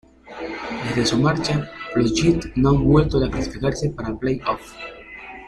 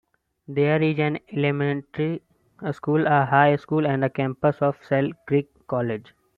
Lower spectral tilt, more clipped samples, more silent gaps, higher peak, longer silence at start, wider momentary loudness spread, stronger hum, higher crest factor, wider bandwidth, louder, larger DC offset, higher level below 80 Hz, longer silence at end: second, -6 dB/octave vs -9.5 dB/octave; neither; neither; about the same, -2 dBFS vs -4 dBFS; second, 0.25 s vs 0.5 s; first, 18 LU vs 11 LU; neither; about the same, 18 dB vs 20 dB; first, 11.5 kHz vs 4.8 kHz; about the same, -21 LUFS vs -23 LUFS; neither; first, -36 dBFS vs -64 dBFS; second, 0 s vs 0.35 s